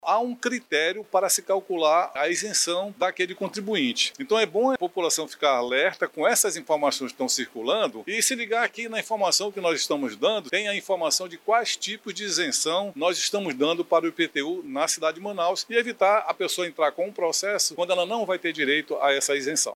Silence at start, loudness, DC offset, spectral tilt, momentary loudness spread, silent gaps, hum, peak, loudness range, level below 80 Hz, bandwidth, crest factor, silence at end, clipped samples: 0.05 s; -24 LUFS; under 0.1%; -1.5 dB/octave; 5 LU; none; none; -8 dBFS; 1 LU; -84 dBFS; 17 kHz; 18 dB; 0 s; under 0.1%